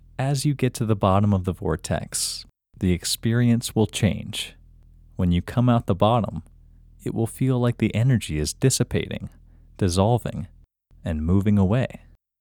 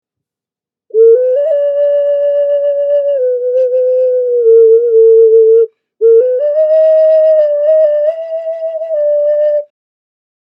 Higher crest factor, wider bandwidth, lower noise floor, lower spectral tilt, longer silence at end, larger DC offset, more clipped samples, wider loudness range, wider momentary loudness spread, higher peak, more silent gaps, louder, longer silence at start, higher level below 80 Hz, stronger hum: first, 20 dB vs 10 dB; first, 18 kHz vs 3.1 kHz; second, -53 dBFS vs -88 dBFS; first, -6 dB/octave vs -4.5 dB/octave; second, 0.45 s vs 0.85 s; neither; neither; about the same, 2 LU vs 4 LU; first, 12 LU vs 9 LU; second, -4 dBFS vs 0 dBFS; neither; second, -23 LUFS vs -10 LUFS; second, 0.2 s vs 0.95 s; first, -42 dBFS vs -76 dBFS; neither